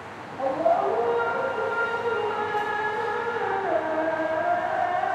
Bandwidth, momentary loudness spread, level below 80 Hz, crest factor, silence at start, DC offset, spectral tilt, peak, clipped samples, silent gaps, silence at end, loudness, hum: 11.5 kHz; 4 LU; -68 dBFS; 16 dB; 0 s; under 0.1%; -5.5 dB/octave; -10 dBFS; under 0.1%; none; 0 s; -26 LUFS; none